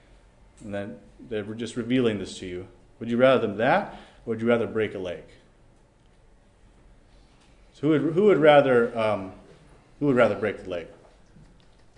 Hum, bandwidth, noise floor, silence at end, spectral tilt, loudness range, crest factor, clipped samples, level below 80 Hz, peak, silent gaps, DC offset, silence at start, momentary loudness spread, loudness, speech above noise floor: none; 10 kHz; -57 dBFS; 1.05 s; -6.5 dB/octave; 9 LU; 20 dB; under 0.1%; -56 dBFS; -4 dBFS; none; under 0.1%; 0.6 s; 21 LU; -24 LUFS; 34 dB